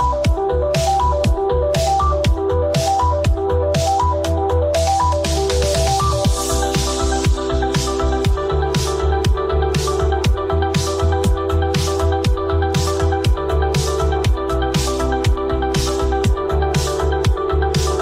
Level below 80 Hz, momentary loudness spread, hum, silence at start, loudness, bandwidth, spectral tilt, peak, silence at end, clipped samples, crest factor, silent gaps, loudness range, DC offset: -22 dBFS; 2 LU; none; 0 s; -18 LUFS; 16 kHz; -5 dB/octave; -6 dBFS; 0 s; under 0.1%; 10 dB; none; 1 LU; under 0.1%